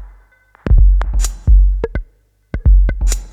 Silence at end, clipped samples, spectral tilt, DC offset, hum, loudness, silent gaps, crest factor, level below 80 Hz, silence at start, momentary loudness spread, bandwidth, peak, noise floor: 0.05 s; under 0.1%; -5.5 dB/octave; under 0.1%; none; -16 LUFS; none; 12 dB; -12 dBFS; 0 s; 14 LU; 11 kHz; 0 dBFS; -51 dBFS